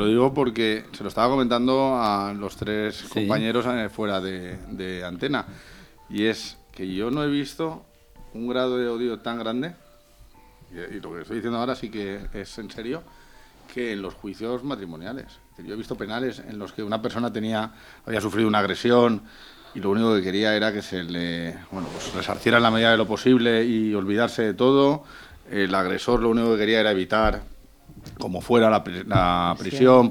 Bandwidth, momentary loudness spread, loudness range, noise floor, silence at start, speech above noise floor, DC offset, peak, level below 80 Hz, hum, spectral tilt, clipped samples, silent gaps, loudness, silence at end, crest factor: 17 kHz; 17 LU; 11 LU; -52 dBFS; 0 s; 28 dB; under 0.1%; -2 dBFS; -46 dBFS; none; -6 dB/octave; under 0.1%; none; -23 LUFS; 0 s; 22 dB